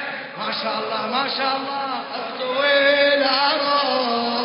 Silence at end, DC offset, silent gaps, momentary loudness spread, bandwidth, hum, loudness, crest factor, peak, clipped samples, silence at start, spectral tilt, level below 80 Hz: 0 s; under 0.1%; none; 11 LU; 5.4 kHz; none; -20 LUFS; 16 dB; -6 dBFS; under 0.1%; 0 s; -6.5 dB/octave; -76 dBFS